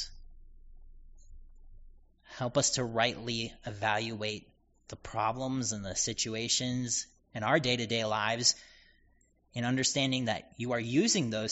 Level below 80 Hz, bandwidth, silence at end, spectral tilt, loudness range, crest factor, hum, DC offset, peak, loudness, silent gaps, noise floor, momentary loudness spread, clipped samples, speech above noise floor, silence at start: -56 dBFS; 8 kHz; 0 s; -3 dB/octave; 4 LU; 22 dB; none; under 0.1%; -12 dBFS; -31 LUFS; none; -67 dBFS; 12 LU; under 0.1%; 36 dB; 0 s